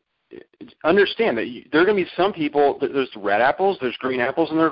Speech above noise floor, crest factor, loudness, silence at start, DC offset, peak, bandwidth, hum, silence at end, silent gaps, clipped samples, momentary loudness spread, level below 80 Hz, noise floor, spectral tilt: 25 dB; 14 dB; -20 LUFS; 0.3 s; under 0.1%; -6 dBFS; 5.4 kHz; none; 0 s; none; under 0.1%; 6 LU; -60 dBFS; -45 dBFS; -10 dB/octave